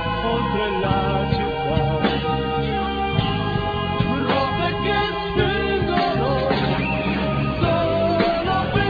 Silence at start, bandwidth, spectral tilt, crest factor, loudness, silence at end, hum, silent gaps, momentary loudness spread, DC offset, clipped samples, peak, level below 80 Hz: 0 s; 5 kHz; -8.5 dB/octave; 16 dB; -21 LUFS; 0 s; none; none; 3 LU; under 0.1%; under 0.1%; -6 dBFS; -34 dBFS